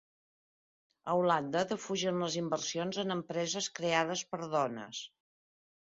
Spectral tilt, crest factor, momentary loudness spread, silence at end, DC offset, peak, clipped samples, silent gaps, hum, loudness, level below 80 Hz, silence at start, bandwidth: -3.5 dB/octave; 22 dB; 10 LU; 0.85 s; under 0.1%; -14 dBFS; under 0.1%; none; none; -34 LUFS; -76 dBFS; 1.05 s; 7.6 kHz